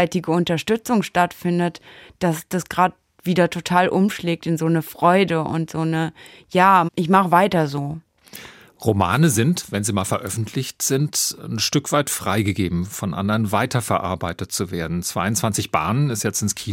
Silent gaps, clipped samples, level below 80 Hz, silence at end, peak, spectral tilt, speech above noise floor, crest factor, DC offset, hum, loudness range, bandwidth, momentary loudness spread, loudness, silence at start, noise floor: none; under 0.1%; -56 dBFS; 0 s; -2 dBFS; -5 dB/octave; 22 dB; 18 dB; under 0.1%; none; 4 LU; 17 kHz; 9 LU; -20 LUFS; 0 s; -42 dBFS